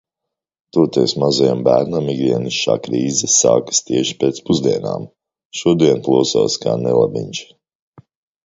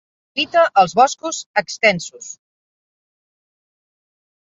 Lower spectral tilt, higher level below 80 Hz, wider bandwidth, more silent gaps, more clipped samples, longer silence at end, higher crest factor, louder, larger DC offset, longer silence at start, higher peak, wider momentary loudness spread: first, -4 dB/octave vs -2.5 dB/octave; first, -54 dBFS vs -66 dBFS; about the same, 8 kHz vs 7.8 kHz; about the same, 5.45-5.50 s vs 1.46-1.54 s; neither; second, 1 s vs 2.25 s; about the same, 16 dB vs 20 dB; about the same, -16 LUFS vs -17 LUFS; neither; first, 0.75 s vs 0.35 s; about the same, 0 dBFS vs -2 dBFS; second, 9 LU vs 17 LU